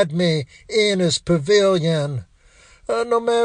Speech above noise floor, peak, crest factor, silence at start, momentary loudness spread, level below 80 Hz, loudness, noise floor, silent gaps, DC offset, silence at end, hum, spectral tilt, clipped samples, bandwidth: 32 dB; -4 dBFS; 14 dB; 0 s; 10 LU; -52 dBFS; -19 LUFS; -51 dBFS; none; under 0.1%; 0 s; none; -5 dB/octave; under 0.1%; 10 kHz